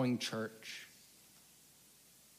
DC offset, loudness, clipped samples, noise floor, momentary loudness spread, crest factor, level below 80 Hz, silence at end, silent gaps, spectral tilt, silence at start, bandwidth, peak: under 0.1%; -41 LUFS; under 0.1%; -64 dBFS; 23 LU; 18 dB; -84 dBFS; 1 s; none; -4.5 dB/octave; 0 s; 15.5 kHz; -24 dBFS